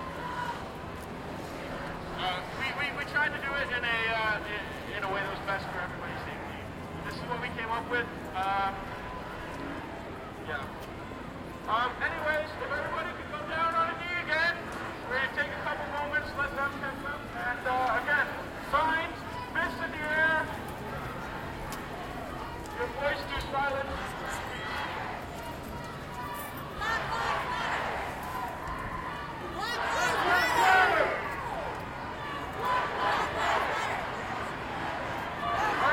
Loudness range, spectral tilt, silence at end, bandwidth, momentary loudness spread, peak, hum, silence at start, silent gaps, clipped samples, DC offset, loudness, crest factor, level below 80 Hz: 7 LU; -4 dB/octave; 0 s; 16 kHz; 12 LU; -10 dBFS; none; 0 s; none; under 0.1%; under 0.1%; -32 LUFS; 22 dB; -50 dBFS